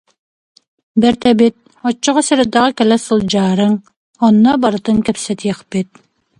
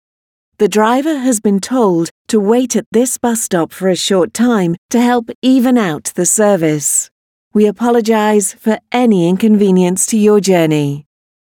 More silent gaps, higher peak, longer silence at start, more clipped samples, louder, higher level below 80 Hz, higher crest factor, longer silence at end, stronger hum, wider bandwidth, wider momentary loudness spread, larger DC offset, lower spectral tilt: second, 3.97-4.14 s vs 2.11-2.25 s, 2.86-2.92 s, 4.78-4.89 s, 5.35-5.42 s, 7.11-7.51 s; about the same, 0 dBFS vs 0 dBFS; first, 0.95 s vs 0.6 s; neither; about the same, -14 LUFS vs -13 LUFS; first, -50 dBFS vs -60 dBFS; about the same, 14 dB vs 12 dB; about the same, 0.55 s vs 0.55 s; neither; second, 11 kHz vs 18.5 kHz; first, 10 LU vs 5 LU; neither; about the same, -5 dB/octave vs -4.5 dB/octave